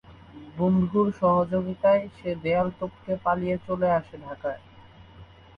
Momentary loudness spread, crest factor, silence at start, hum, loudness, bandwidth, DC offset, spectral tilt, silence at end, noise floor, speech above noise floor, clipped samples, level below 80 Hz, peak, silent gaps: 13 LU; 16 dB; 0.1 s; none; -25 LUFS; 5 kHz; under 0.1%; -9.5 dB/octave; 0.35 s; -49 dBFS; 25 dB; under 0.1%; -54 dBFS; -10 dBFS; none